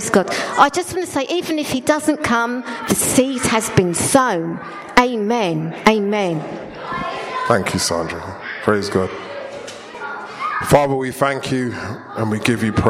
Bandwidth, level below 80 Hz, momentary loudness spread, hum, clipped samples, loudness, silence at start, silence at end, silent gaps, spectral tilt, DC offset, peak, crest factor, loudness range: 16 kHz; -46 dBFS; 14 LU; none; under 0.1%; -18 LUFS; 0 s; 0 s; none; -4 dB/octave; under 0.1%; 0 dBFS; 18 dB; 4 LU